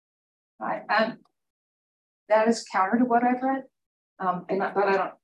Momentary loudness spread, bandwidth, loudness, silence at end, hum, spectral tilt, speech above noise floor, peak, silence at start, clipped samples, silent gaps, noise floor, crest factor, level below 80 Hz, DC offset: 10 LU; 10.5 kHz; -25 LUFS; 0.1 s; none; -5 dB/octave; over 66 dB; -10 dBFS; 0.6 s; under 0.1%; 1.50-2.26 s, 3.86-4.17 s; under -90 dBFS; 16 dB; -80 dBFS; under 0.1%